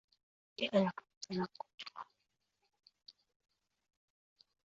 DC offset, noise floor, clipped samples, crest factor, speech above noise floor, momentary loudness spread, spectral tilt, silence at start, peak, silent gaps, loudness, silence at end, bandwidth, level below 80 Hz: under 0.1%; -85 dBFS; under 0.1%; 24 dB; 48 dB; 20 LU; -4.5 dB/octave; 0.6 s; -20 dBFS; 1.17-1.21 s, 1.74-1.78 s; -39 LUFS; 1.55 s; 7.4 kHz; -82 dBFS